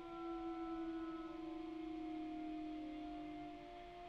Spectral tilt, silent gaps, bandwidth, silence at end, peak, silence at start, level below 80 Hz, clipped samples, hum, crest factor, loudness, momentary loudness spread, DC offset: -6.5 dB/octave; none; 7.2 kHz; 0 s; -38 dBFS; 0 s; -66 dBFS; under 0.1%; none; 10 dB; -48 LUFS; 5 LU; under 0.1%